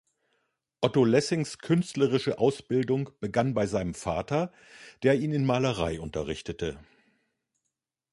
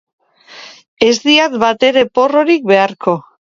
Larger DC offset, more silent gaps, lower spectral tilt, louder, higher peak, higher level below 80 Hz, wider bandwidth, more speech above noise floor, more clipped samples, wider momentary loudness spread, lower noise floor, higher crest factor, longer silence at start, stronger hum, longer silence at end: neither; second, none vs 0.88-0.97 s; first, -6 dB/octave vs -4 dB/octave; second, -28 LUFS vs -12 LUFS; second, -8 dBFS vs 0 dBFS; about the same, -52 dBFS vs -56 dBFS; first, 11.5 kHz vs 7.6 kHz; first, 57 dB vs 26 dB; neither; about the same, 9 LU vs 7 LU; first, -84 dBFS vs -38 dBFS; first, 20 dB vs 14 dB; first, 0.8 s vs 0.55 s; neither; first, 1.3 s vs 0.4 s